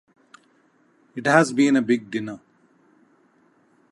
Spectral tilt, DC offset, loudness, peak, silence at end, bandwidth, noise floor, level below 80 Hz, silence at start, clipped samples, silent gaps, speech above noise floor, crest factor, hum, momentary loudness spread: -5.5 dB/octave; under 0.1%; -20 LUFS; -2 dBFS; 1.55 s; 11.5 kHz; -61 dBFS; -74 dBFS; 1.15 s; under 0.1%; none; 41 dB; 22 dB; none; 20 LU